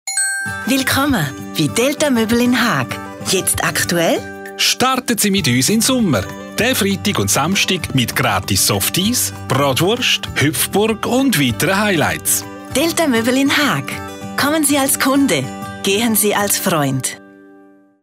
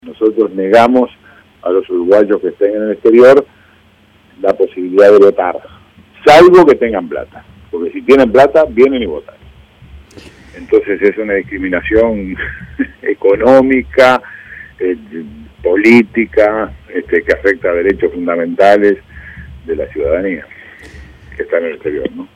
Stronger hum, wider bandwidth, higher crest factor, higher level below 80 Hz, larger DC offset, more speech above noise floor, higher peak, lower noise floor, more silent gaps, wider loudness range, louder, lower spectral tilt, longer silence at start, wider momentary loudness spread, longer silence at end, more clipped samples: neither; first, 16 kHz vs 12 kHz; about the same, 12 dB vs 12 dB; second, -48 dBFS vs -40 dBFS; neither; second, 30 dB vs 37 dB; second, -4 dBFS vs 0 dBFS; about the same, -46 dBFS vs -47 dBFS; neither; second, 1 LU vs 7 LU; second, -15 LUFS vs -11 LUFS; second, -3.5 dB/octave vs -6 dB/octave; about the same, 0.05 s vs 0.05 s; second, 6 LU vs 17 LU; first, 0.7 s vs 0.1 s; second, under 0.1% vs 1%